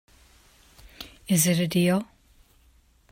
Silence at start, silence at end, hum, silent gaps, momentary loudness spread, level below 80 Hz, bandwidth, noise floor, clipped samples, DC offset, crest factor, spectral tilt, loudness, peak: 1 s; 1.1 s; none; none; 22 LU; -58 dBFS; 16.5 kHz; -60 dBFS; under 0.1%; under 0.1%; 20 dB; -4.5 dB/octave; -23 LUFS; -8 dBFS